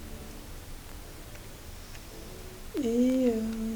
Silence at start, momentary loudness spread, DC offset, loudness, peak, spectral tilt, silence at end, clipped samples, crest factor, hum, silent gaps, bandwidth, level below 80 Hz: 0 s; 19 LU; under 0.1%; -28 LUFS; -16 dBFS; -5.5 dB/octave; 0 s; under 0.1%; 16 dB; none; none; over 20 kHz; -46 dBFS